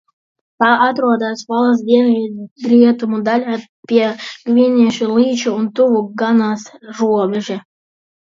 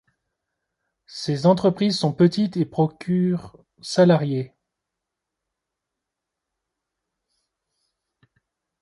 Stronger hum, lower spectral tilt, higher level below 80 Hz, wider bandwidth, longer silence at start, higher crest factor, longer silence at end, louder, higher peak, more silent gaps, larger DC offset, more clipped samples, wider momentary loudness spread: neither; second, -5.5 dB/octave vs -7 dB/octave; about the same, -66 dBFS vs -64 dBFS; second, 7.4 kHz vs 11.5 kHz; second, 0.6 s vs 1.1 s; second, 14 dB vs 20 dB; second, 0.7 s vs 4.35 s; first, -15 LUFS vs -21 LUFS; first, 0 dBFS vs -4 dBFS; first, 2.51-2.56 s, 3.69-3.83 s vs none; neither; neither; about the same, 13 LU vs 13 LU